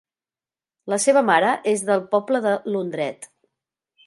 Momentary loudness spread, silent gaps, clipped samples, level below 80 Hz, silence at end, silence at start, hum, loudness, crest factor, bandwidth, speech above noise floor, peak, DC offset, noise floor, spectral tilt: 12 LU; none; under 0.1%; -76 dBFS; 0.8 s; 0.85 s; none; -21 LUFS; 20 dB; 11.5 kHz; over 70 dB; -2 dBFS; under 0.1%; under -90 dBFS; -4 dB/octave